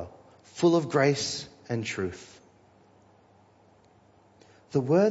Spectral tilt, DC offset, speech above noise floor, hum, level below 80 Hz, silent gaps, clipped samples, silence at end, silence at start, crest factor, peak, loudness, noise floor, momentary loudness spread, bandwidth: -5.5 dB/octave; under 0.1%; 34 dB; none; -66 dBFS; none; under 0.1%; 0 s; 0 s; 20 dB; -10 dBFS; -27 LUFS; -60 dBFS; 18 LU; 8 kHz